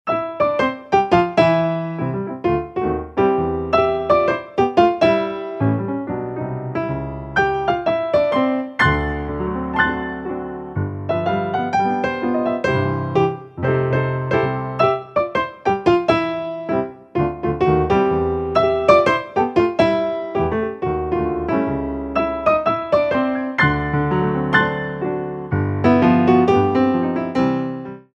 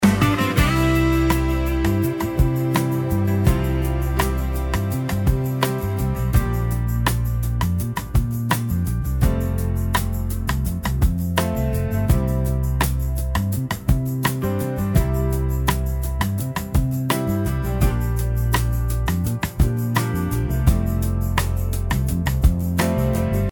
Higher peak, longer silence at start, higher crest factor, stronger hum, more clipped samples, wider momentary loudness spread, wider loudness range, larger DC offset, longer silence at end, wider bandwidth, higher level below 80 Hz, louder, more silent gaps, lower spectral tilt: about the same, 0 dBFS vs -2 dBFS; about the same, 0.05 s vs 0 s; about the same, 18 dB vs 18 dB; neither; neither; first, 9 LU vs 4 LU; about the same, 4 LU vs 2 LU; neither; first, 0.15 s vs 0 s; second, 8.2 kHz vs 18 kHz; second, -40 dBFS vs -24 dBFS; first, -19 LUFS vs -22 LUFS; neither; first, -7.5 dB/octave vs -6 dB/octave